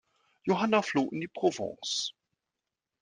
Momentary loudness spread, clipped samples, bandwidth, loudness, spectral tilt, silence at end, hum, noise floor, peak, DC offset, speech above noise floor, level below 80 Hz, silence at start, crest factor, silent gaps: 10 LU; under 0.1%; 10 kHz; -30 LUFS; -4 dB/octave; 0.9 s; none; -88 dBFS; -12 dBFS; under 0.1%; 58 dB; -76 dBFS; 0.45 s; 20 dB; none